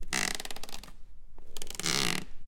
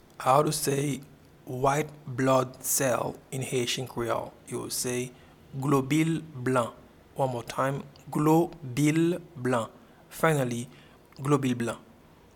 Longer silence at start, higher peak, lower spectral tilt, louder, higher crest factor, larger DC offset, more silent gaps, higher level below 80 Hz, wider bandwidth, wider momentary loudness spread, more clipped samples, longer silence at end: second, 0 s vs 0.2 s; about the same, -6 dBFS vs -8 dBFS; second, -1.5 dB/octave vs -5 dB/octave; second, -32 LUFS vs -28 LUFS; first, 26 dB vs 20 dB; neither; neither; first, -46 dBFS vs -60 dBFS; second, 17 kHz vs 19 kHz; first, 19 LU vs 13 LU; neither; second, 0 s vs 0.55 s